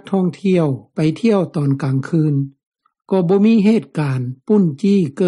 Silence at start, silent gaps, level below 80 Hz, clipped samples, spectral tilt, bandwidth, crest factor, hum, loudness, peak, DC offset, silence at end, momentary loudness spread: 0.05 s; 2.66-2.72 s; -60 dBFS; under 0.1%; -8.5 dB/octave; 11 kHz; 12 dB; none; -17 LUFS; -4 dBFS; under 0.1%; 0 s; 8 LU